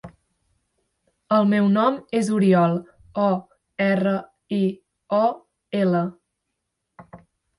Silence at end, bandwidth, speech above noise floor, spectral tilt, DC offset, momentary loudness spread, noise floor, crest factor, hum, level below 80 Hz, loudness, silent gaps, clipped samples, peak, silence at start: 0.4 s; 11.5 kHz; 59 dB; -7.5 dB/octave; under 0.1%; 12 LU; -79 dBFS; 16 dB; none; -64 dBFS; -22 LUFS; none; under 0.1%; -6 dBFS; 0.05 s